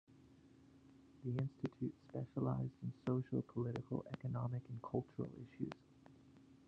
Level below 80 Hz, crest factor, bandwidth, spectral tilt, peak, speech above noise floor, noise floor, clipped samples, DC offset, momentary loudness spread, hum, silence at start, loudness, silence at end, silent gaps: -74 dBFS; 20 dB; 6.6 kHz; -10 dB/octave; -24 dBFS; 22 dB; -66 dBFS; under 0.1%; under 0.1%; 9 LU; none; 0.1 s; -44 LUFS; 0.1 s; none